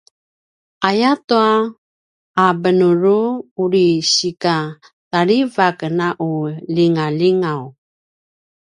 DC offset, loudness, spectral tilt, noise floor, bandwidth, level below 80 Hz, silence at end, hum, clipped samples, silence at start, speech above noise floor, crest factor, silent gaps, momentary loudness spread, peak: under 0.1%; -16 LUFS; -5 dB/octave; under -90 dBFS; 10.5 kHz; -64 dBFS; 0.95 s; none; under 0.1%; 0.8 s; over 74 dB; 16 dB; 1.24-1.28 s, 1.78-2.34 s, 3.51-3.56 s, 4.93-5.11 s; 8 LU; 0 dBFS